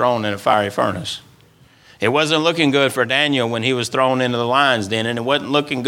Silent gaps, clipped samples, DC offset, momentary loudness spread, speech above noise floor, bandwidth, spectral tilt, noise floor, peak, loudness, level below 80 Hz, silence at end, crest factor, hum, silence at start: none; under 0.1%; under 0.1%; 5 LU; 33 dB; 17.5 kHz; -4.5 dB/octave; -50 dBFS; 0 dBFS; -17 LUFS; -60 dBFS; 0 s; 18 dB; none; 0 s